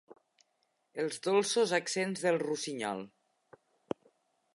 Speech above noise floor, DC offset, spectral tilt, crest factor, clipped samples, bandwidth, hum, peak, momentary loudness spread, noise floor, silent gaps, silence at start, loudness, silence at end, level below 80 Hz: 46 dB; under 0.1%; -3.5 dB/octave; 20 dB; under 0.1%; 11.5 kHz; none; -14 dBFS; 14 LU; -78 dBFS; none; 0.95 s; -33 LUFS; 1.5 s; -84 dBFS